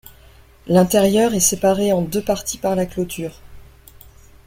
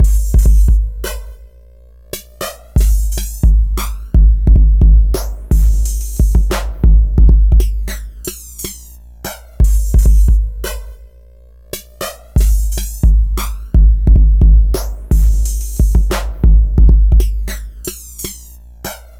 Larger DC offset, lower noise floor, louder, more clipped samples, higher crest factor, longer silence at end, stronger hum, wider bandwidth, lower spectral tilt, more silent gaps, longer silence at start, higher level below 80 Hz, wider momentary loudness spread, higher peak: second, under 0.1% vs 0.4%; first, -47 dBFS vs -40 dBFS; second, -18 LUFS vs -14 LUFS; neither; first, 18 dB vs 10 dB; first, 0.85 s vs 0.2 s; second, none vs 60 Hz at -35 dBFS; about the same, 16.5 kHz vs 16 kHz; second, -4.5 dB/octave vs -6 dB/octave; neither; first, 0.65 s vs 0 s; second, -44 dBFS vs -12 dBFS; second, 10 LU vs 16 LU; about the same, -2 dBFS vs 0 dBFS